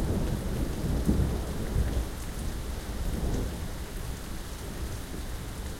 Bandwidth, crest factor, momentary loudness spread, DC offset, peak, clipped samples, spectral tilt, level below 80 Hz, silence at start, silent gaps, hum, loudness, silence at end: 16.5 kHz; 20 dB; 9 LU; under 0.1%; -10 dBFS; under 0.1%; -6 dB/octave; -34 dBFS; 0 s; none; none; -33 LUFS; 0 s